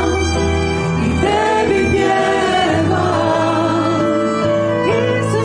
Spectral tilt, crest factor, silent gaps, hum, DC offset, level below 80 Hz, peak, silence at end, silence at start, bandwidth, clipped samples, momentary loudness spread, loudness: -5.5 dB/octave; 12 dB; none; none; under 0.1%; -32 dBFS; -2 dBFS; 0 s; 0 s; 10.5 kHz; under 0.1%; 2 LU; -15 LUFS